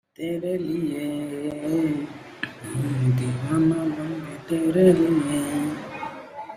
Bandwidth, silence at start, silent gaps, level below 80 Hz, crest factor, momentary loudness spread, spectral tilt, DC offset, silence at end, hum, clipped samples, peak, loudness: 15 kHz; 0.2 s; none; -58 dBFS; 18 dB; 16 LU; -7 dB/octave; under 0.1%; 0 s; none; under 0.1%; -6 dBFS; -24 LUFS